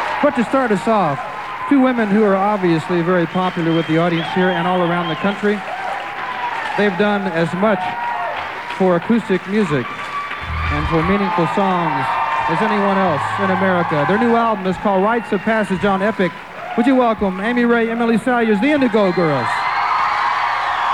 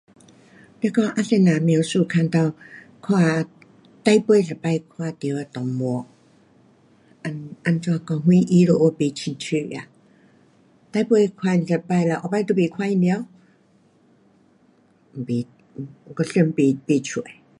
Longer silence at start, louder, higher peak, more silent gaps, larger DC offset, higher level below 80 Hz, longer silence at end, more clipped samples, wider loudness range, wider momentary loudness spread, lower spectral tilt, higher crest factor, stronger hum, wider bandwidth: second, 0 s vs 0.85 s; first, -17 LUFS vs -21 LUFS; about the same, -4 dBFS vs -2 dBFS; neither; first, 0.3% vs under 0.1%; first, -40 dBFS vs -66 dBFS; second, 0 s vs 0.25 s; neither; second, 3 LU vs 7 LU; second, 7 LU vs 16 LU; about the same, -7 dB/octave vs -7 dB/octave; second, 14 dB vs 20 dB; neither; first, 12.5 kHz vs 11 kHz